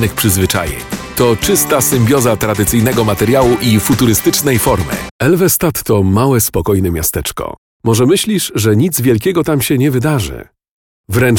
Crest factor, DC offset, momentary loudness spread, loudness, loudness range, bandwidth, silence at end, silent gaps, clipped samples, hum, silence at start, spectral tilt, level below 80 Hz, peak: 12 dB; under 0.1%; 8 LU; -12 LUFS; 2 LU; 19 kHz; 0 s; 5.11-5.19 s, 7.58-7.80 s, 10.69-11.04 s; under 0.1%; none; 0 s; -5 dB/octave; -32 dBFS; 0 dBFS